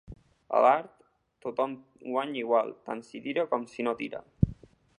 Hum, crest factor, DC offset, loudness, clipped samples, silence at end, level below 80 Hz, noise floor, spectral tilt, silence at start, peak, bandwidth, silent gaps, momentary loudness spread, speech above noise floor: none; 22 dB; under 0.1%; -30 LUFS; under 0.1%; 0.45 s; -50 dBFS; -48 dBFS; -7.5 dB/octave; 0.1 s; -8 dBFS; 10.5 kHz; none; 15 LU; 19 dB